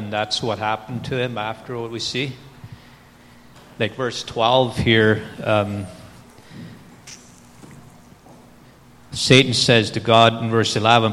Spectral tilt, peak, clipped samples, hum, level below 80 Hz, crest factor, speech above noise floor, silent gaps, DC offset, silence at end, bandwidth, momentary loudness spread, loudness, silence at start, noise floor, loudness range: -4.5 dB/octave; 0 dBFS; under 0.1%; none; -50 dBFS; 22 dB; 29 dB; none; under 0.1%; 0 s; 14 kHz; 24 LU; -19 LUFS; 0 s; -47 dBFS; 11 LU